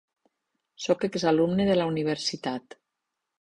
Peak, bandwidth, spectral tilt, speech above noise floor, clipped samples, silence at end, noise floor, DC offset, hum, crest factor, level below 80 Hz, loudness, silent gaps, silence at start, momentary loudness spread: -8 dBFS; 11 kHz; -5.5 dB/octave; 58 dB; under 0.1%; 0.85 s; -84 dBFS; under 0.1%; none; 20 dB; -62 dBFS; -26 LUFS; none; 0.8 s; 11 LU